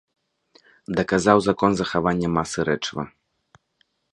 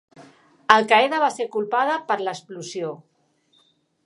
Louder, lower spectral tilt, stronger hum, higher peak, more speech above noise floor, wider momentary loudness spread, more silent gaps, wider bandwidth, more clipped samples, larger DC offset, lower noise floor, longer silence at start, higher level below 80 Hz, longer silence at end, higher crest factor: about the same, -22 LUFS vs -21 LUFS; first, -5.5 dB/octave vs -3 dB/octave; neither; about the same, 0 dBFS vs 0 dBFS; first, 47 dB vs 43 dB; second, 11 LU vs 18 LU; neither; about the same, 11.5 kHz vs 11.5 kHz; neither; neither; first, -68 dBFS vs -64 dBFS; first, 0.9 s vs 0.2 s; first, -50 dBFS vs -68 dBFS; about the same, 1.05 s vs 1.1 s; about the same, 24 dB vs 24 dB